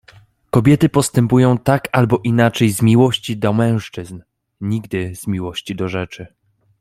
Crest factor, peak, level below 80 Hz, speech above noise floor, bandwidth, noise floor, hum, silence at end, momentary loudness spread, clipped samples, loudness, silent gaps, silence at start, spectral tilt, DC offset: 16 dB; -2 dBFS; -48 dBFS; 32 dB; 15 kHz; -48 dBFS; none; 0.55 s; 13 LU; under 0.1%; -16 LUFS; none; 0.55 s; -6 dB/octave; under 0.1%